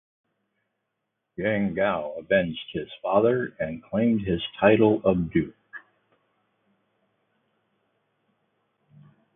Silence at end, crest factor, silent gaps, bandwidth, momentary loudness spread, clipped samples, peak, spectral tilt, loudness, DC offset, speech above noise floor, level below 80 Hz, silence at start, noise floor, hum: 3.55 s; 22 dB; none; 3.8 kHz; 15 LU; under 0.1%; -6 dBFS; -11 dB/octave; -24 LUFS; under 0.1%; 57 dB; -54 dBFS; 1.4 s; -81 dBFS; none